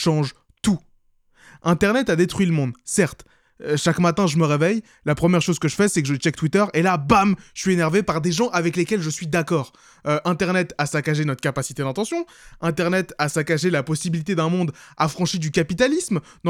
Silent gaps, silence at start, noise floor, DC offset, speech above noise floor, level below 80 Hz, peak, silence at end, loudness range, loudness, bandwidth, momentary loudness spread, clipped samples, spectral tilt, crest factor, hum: none; 0 s; -59 dBFS; under 0.1%; 38 dB; -50 dBFS; 0 dBFS; 0 s; 3 LU; -21 LUFS; 15.5 kHz; 7 LU; under 0.1%; -5.5 dB/octave; 20 dB; none